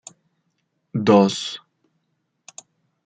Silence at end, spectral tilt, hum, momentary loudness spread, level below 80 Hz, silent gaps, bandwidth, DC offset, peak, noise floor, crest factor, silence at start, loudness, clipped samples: 1.5 s; -5.5 dB/octave; none; 27 LU; -68 dBFS; none; 9.4 kHz; under 0.1%; -2 dBFS; -73 dBFS; 22 dB; 0.95 s; -19 LUFS; under 0.1%